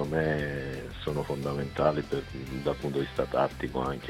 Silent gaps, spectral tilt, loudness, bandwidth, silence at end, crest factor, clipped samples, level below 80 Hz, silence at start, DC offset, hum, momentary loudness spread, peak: none; -7 dB/octave; -31 LUFS; 15.5 kHz; 0 s; 20 dB; under 0.1%; -48 dBFS; 0 s; under 0.1%; none; 7 LU; -10 dBFS